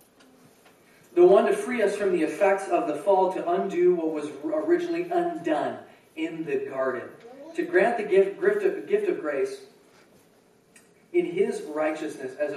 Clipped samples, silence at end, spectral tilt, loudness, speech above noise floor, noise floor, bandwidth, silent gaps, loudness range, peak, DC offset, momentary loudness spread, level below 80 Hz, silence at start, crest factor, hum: under 0.1%; 0 s; -6 dB/octave; -25 LUFS; 35 dB; -60 dBFS; 12.5 kHz; none; 6 LU; -8 dBFS; under 0.1%; 11 LU; -80 dBFS; 1.15 s; 18 dB; none